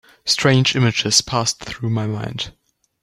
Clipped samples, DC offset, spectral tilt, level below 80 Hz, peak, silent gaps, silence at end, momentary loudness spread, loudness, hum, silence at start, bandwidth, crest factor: under 0.1%; under 0.1%; -3.5 dB/octave; -50 dBFS; 0 dBFS; none; 0.5 s; 12 LU; -18 LUFS; none; 0.25 s; 14 kHz; 20 dB